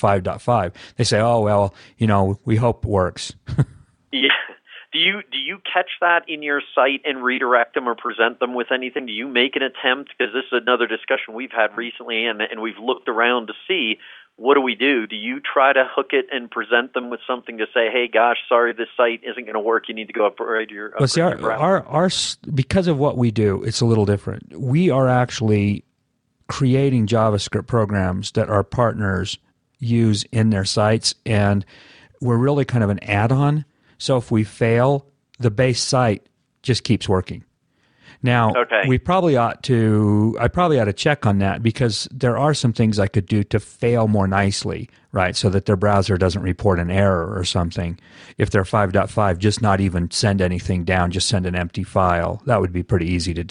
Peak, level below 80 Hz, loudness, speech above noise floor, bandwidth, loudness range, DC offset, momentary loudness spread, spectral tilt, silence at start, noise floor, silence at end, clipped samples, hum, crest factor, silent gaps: -2 dBFS; -44 dBFS; -19 LUFS; 50 dB; 10.5 kHz; 2 LU; under 0.1%; 8 LU; -5.5 dB/octave; 0 s; -69 dBFS; 0 s; under 0.1%; none; 18 dB; none